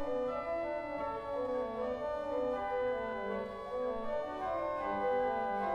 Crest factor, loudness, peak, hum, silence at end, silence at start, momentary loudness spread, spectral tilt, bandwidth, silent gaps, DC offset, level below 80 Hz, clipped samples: 12 dB; -36 LUFS; -24 dBFS; none; 0 s; 0 s; 5 LU; -6.5 dB/octave; 8.2 kHz; none; under 0.1%; -60 dBFS; under 0.1%